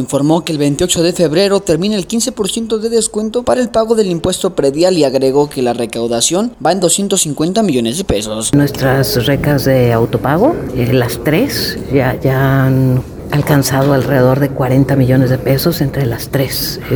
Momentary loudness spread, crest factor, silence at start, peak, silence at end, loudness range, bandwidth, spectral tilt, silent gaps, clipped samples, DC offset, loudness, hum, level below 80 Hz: 5 LU; 12 dB; 0 s; 0 dBFS; 0 s; 1 LU; over 20 kHz; -5 dB/octave; none; under 0.1%; under 0.1%; -13 LUFS; none; -36 dBFS